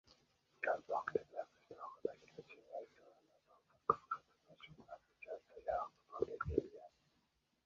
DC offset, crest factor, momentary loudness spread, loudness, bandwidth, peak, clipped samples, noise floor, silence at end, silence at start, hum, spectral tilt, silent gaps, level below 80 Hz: under 0.1%; 30 dB; 19 LU; -44 LUFS; 7.4 kHz; -16 dBFS; under 0.1%; -82 dBFS; 0.8 s; 0.6 s; none; -5 dB/octave; none; -64 dBFS